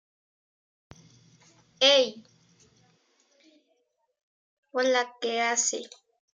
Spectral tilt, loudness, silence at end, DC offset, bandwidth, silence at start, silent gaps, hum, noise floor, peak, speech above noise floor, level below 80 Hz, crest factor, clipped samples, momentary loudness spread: 0 dB/octave; -25 LUFS; 0.5 s; under 0.1%; 9.8 kHz; 1.8 s; 4.23-4.63 s; none; -74 dBFS; -8 dBFS; 48 dB; -80 dBFS; 24 dB; under 0.1%; 15 LU